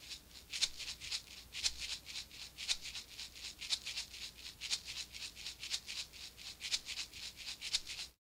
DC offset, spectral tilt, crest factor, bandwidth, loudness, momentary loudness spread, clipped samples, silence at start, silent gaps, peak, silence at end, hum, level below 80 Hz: under 0.1%; 1 dB/octave; 26 dB; 16 kHz; -41 LUFS; 10 LU; under 0.1%; 0 s; none; -18 dBFS; 0.1 s; none; -64 dBFS